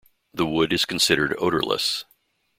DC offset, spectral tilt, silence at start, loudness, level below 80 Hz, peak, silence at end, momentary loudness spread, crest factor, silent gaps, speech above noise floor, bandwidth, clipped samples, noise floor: under 0.1%; -3 dB/octave; 0.35 s; -22 LUFS; -54 dBFS; -2 dBFS; 0.55 s; 9 LU; 22 dB; none; 43 dB; 16.5 kHz; under 0.1%; -65 dBFS